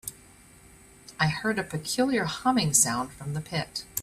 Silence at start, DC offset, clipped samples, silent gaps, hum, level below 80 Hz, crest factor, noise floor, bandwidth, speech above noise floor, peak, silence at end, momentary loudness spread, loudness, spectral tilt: 0.05 s; under 0.1%; under 0.1%; none; none; -56 dBFS; 22 dB; -53 dBFS; 15.5 kHz; 26 dB; -8 dBFS; 0 s; 13 LU; -26 LUFS; -3.5 dB/octave